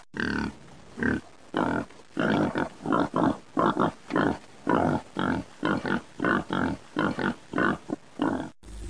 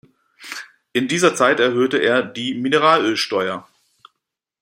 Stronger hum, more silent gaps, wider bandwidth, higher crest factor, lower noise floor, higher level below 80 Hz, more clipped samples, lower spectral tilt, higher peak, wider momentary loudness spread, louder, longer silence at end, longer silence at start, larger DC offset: neither; neither; second, 10.5 kHz vs 16 kHz; about the same, 20 dB vs 18 dB; second, -47 dBFS vs -80 dBFS; first, -52 dBFS vs -66 dBFS; neither; first, -6.5 dB/octave vs -3.5 dB/octave; second, -10 dBFS vs 0 dBFS; second, 8 LU vs 17 LU; second, -28 LUFS vs -18 LUFS; second, 0 s vs 1 s; second, 0.15 s vs 0.4 s; first, 0.3% vs under 0.1%